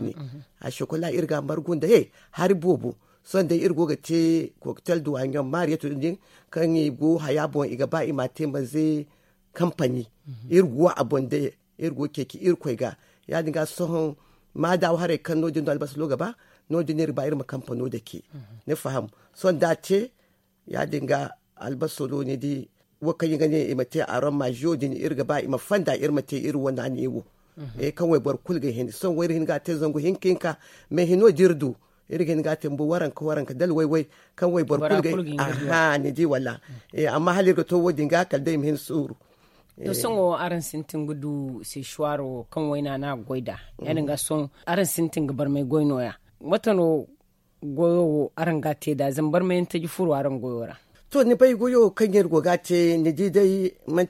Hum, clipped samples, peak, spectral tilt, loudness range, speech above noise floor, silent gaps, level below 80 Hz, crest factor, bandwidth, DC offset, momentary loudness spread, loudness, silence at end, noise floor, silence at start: none; under 0.1%; -4 dBFS; -6.5 dB/octave; 5 LU; 42 dB; none; -62 dBFS; 20 dB; 16.5 kHz; under 0.1%; 12 LU; -25 LUFS; 0 s; -65 dBFS; 0 s